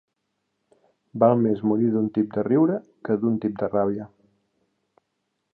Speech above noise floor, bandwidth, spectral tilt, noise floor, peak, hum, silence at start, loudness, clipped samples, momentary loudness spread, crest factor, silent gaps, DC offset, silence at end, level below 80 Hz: 55 dB; 4.3 kHz; -12 dB/octave; -77 dBFS; -6 dBFS; none; 1.15 s; -23 LUFS; under 0.1%; 11 LU; 20 dB; none; under 0.1%; 1.45 s; -64 dBFS